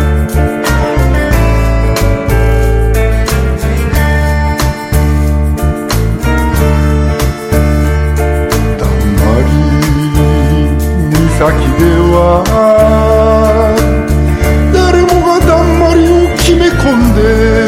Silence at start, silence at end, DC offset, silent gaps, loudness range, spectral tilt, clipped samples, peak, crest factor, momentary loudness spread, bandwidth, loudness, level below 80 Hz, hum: 0 s; 0 s; under 0.1%; none; 3 LU; -6.5 dB/octave; 0.9%; 0 dBFS; 8 dB; 5 LU; 16 kHz; -10 LUFS; -12 dBFS; none